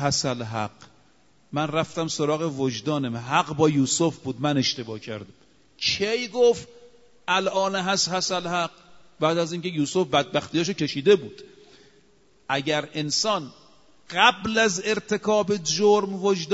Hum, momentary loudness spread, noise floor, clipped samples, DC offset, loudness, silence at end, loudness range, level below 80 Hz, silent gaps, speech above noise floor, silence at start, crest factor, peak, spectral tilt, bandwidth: none; 10 LU; -61 dBFS; under 0.1%; under 0.1%; -24 LUFS; 0 s; 3 LU; -62 dBFS; none; 37 dB; 0 s; 22 dB; -4 dBFS; -4 dB/octave; 8 kHz